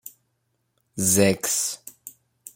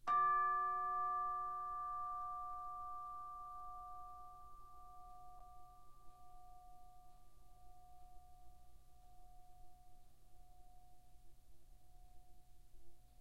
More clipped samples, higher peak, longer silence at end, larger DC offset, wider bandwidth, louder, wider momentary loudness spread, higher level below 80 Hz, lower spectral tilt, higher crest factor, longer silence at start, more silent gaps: neither; first, -4 dBFS vs -28 dBFS; about the same, 0.05 s vs 0 s; second, under 0.1% vs 0.1%; about the same, 16.5 kHz vs 15.5 kHz; first, -21 LUFS vs -42 LUFS; second, 22 LU vs 28 LU; about the same, -62 dBFS vs -64 dBFS; about the same, -3.5 dB/octave vs -4.5 dB/octave; about the same, 22 dB vs 18 dB; about the same, 0.05 s vs 0 s; neither